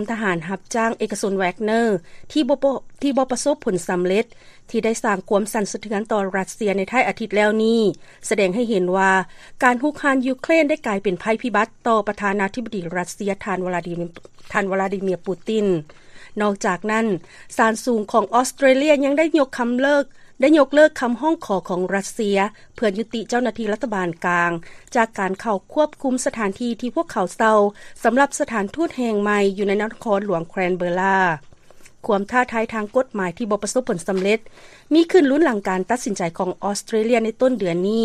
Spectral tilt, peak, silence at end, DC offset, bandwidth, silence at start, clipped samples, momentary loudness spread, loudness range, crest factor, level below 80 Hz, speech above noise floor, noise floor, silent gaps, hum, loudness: -5 dB/octave; -2 dBFS; 0 s; under 0.1%; 14 kHz; 0 s; under 0.1%; 8 LU; 4 LU; 18 dB; -52 dBFS; 24 dB; -44 dBFS; none; none; -20 LUFS